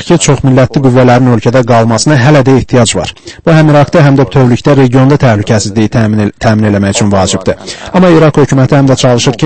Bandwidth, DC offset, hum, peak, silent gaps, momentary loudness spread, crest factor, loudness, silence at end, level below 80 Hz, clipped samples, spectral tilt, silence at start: 8.8 kHz; under 0.1%; none; 0 dBFS; none; 5 LU; 6 dB; -7 LUFS; 0 s; -32 dBFS; 3%; -6 dB/octave; 0 s